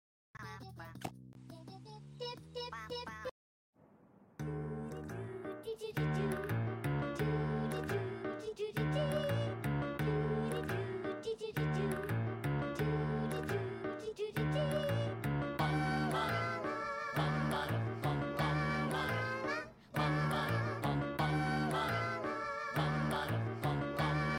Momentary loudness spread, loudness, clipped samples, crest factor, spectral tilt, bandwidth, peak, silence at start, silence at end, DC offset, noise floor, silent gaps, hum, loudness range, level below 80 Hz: 11 LU; -37 LUFS; under 0.1%; 14 dB; -6.5 dB/octave; 16.5 kHz; -24 dBFS; 0.35 s; 0 s; under 0.1%; -64 dBFS; 3.31-3.73 s; none; 10 LU; -56 dBFS